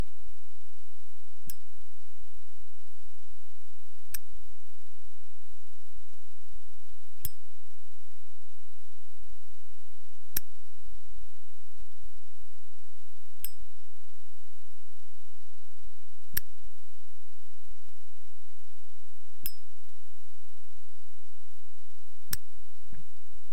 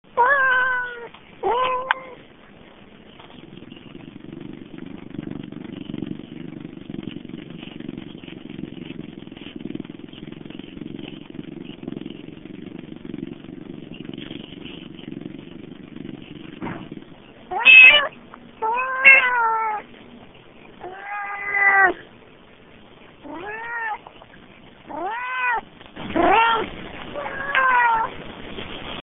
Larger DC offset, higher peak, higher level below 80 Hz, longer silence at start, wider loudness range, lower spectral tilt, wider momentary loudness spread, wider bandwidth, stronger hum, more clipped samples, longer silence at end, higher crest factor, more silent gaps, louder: first, 10% vs under 0.1%; second, -6 dBFS vs 0 dBFS; second, -60 dBFS vs -54 dBFS; second, 0 s vs 0.15 s; second, 7 LU vs 23 LU; first, -4 dB/octave vs 2 dB/octave; about the same, 22 LU vs 23 LU; first, 17 kHz vs 3.9 kHz; neither; neither; about the same, 0 s vs 0 s; first, 40 dB vs 24 dB; neither; second, -41 LUFS vs -16 LUFS